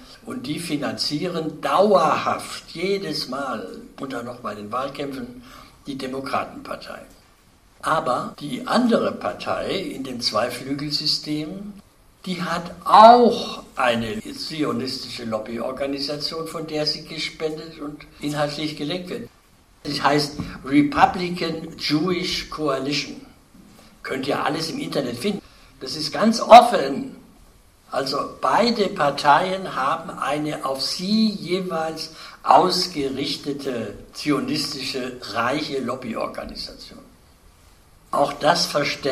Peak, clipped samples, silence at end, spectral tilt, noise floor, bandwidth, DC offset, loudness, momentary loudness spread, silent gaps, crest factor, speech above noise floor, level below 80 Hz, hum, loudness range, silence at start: 0 dBFS; under 0.1%; 0 s; -4.5 dB/octave; -54 dBFS; 15.5 kHz; under 0.1%; -21 LUFS; 16 LU; none; 22 dB; 33 dB; -52 dBFS; none; 10 LU; 0 s